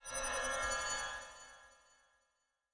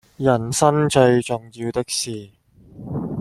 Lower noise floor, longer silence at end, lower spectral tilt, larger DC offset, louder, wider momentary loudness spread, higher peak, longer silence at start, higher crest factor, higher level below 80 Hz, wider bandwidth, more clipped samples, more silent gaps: first, -83 dBFS vs -41 dBFS; first, 1 s vs 0 s; second, 0 dB/octave vs -5 dB/octave; neither; second, -38 LUFS vs -20 LUFS; first, 19 LU vs 14 LU; second, -26 dBFS vs -2 dBFS; second, 0 s vs 0.2 s; about the same, 18 dB vs 18 dB; second, -58 dBFS vs -52 dBFS; second, 10.5 kHz vs 14 kHz; neither; neither